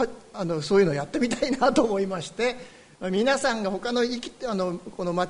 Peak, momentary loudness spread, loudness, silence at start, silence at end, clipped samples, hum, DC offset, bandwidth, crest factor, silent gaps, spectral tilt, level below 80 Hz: -8 dBFS; 9 LU; -26 LUFS; 0 s; 0 s; under 0.1%; none; under 0.1%; 10.5 kHz; 18 dB; none; -5 dB/octave; -54 dBFS